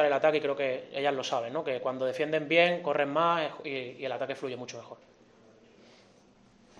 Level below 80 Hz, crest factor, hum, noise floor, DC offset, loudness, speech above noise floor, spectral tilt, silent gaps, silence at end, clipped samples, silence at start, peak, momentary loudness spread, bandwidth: -78 dBFS; 22 dB; none; -60 dBFS; under 0.1%; -30 LUFS; 30 dB; -4.5 dB/octave; none; 1.85 s; under 0.1%; 0 s; -10 dBFS; 12 LU; 10 kHz